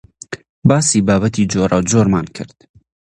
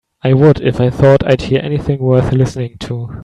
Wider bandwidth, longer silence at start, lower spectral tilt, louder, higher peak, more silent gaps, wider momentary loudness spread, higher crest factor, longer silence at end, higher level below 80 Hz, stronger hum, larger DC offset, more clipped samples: first, 11.5 kHz vs 9.6 kHz; about the same, 0.3 s vs 0.25 s; second, -5.5 dB/octave vs -8 dB/octave; about the same, -14 LUFS vs -12 LUFS; about the same, 0 dBFS vs 0 dBFS; first, 0.49-0.62 s vs none; first, 18 LU vs 12 LU; about the same, 16 dB vs 12 dB; first, 0.7 s vs 0 s; second, -40 dBFS vs -34 dBFS; neither; neither; neither